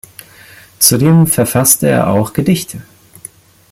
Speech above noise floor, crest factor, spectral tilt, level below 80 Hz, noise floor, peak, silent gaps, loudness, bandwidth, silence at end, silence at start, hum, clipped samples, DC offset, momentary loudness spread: 29 dB; 14 dB; -4.5 dB/octave; -44 dBFS; -40 dBFS; 0 dBFS; none; -11 LUFS; 17 kHz; 0.9 s; 0.8 s; none; 0.1%; under 0.1%; 8 LU